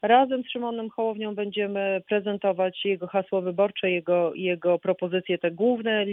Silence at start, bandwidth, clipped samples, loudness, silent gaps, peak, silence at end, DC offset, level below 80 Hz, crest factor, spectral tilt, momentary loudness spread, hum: 0.05 s; 3.9 kHz; under 0.1%; -26 LUFS; none; -6 dBFS; 0 s; under 0.1%; -74 dBFS; 18 dB; -9 dB/octave; 5 LU; none